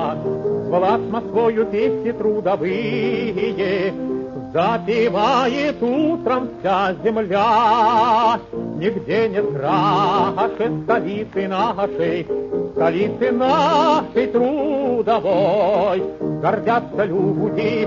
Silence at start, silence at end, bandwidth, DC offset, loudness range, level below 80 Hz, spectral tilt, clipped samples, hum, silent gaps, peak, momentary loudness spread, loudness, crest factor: 0 s; 0 s; 7.4 kHz; under 0.1%; 3 LU; -52 dBFS; -7 dB/octave; under 0.1%; none; none; -4 dBFS; 7 LU; -19 LUFS; 14 dB